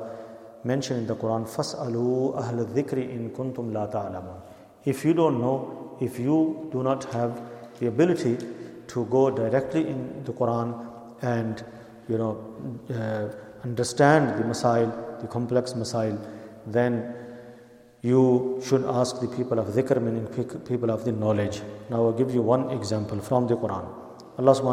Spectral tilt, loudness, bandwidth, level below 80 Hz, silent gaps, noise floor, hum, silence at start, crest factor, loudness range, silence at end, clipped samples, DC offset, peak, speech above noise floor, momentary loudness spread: -6.5 dB/octave; -26 LUFS; 15 kHz; -64 dBFS; none; -51 dBFS; none; 0 s; 22 dB; 4 LU; 0 s; under 0.1%; under 0.1%; -4 dBFS; 26 dB; 15 LU